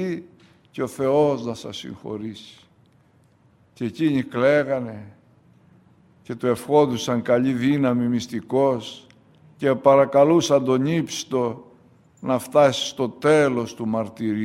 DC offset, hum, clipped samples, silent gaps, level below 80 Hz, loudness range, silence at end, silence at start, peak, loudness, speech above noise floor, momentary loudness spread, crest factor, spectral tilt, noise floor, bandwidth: under 0.1%; none; under 0.1%; none; -64 dBFS; 7 LU; 0 s; 0 s; -2 dBFS; -21 LUFS; 37 dB; 17 LU; 20 dB; -5.5 dB/octave; -58 dBFS; 15 kHz